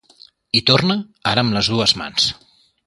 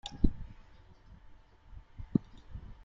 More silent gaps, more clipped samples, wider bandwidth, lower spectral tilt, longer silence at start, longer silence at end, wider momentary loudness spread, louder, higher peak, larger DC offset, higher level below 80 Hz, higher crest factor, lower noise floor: neither; neither; first, 11.5 kHz vs 7.6 kHz; second, -4 dB/octave vs -7.5 dB/octave; first, 0.55 s vs 0.05 s; first, 0.55 s vs 0.1 s; second, 7 LU vs 25 LU; first, -17 LUFS vs -35 LUFS; first, 0 dBFS vs -8 dBFS; neither; second, -48 dBFS vs -40 dBFS; second, 20 dB vs 28 dB; second, -50 dBFS vs -56 dBFS